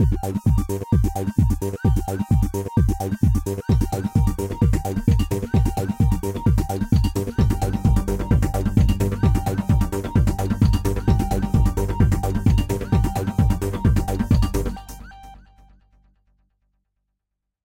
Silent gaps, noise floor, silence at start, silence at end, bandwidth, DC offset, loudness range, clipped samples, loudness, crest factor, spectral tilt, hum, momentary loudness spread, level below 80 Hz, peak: none; -81 dBFS; 0 s; 2.25 s; 16.5 kHz; under 0.1%; 3 LU; under 0.1%; -21 LUFS; 16 dB; -7.5 dB/octave; none; 3 LU; -26 dBFS; -4 dBFS